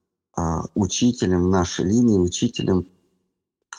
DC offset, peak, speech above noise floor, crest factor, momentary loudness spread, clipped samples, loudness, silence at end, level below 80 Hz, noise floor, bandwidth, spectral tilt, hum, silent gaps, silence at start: under 0.1%; -8 dBFS; 58 dB; 14 dB; 8 LU; under 0.1%; -21 LUFS; 0.05 s; -44 dBFS; -77 dBFS; 10 kHz; -5.5 dB/octave; none; none; 0.35 s